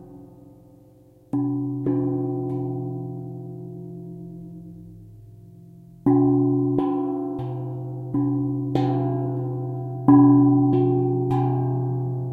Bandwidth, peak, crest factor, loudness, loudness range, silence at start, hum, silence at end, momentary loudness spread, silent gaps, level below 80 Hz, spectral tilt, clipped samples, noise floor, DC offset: 4.4 kHz; -4 dBFS; 20 dB; -22 LUFS; 12 LU; 0 s; none; 0 s; 20 LU; none; -56 dBFS; -11.5 dB/octave; under 0.1%; -52 dBFS; under 0.1%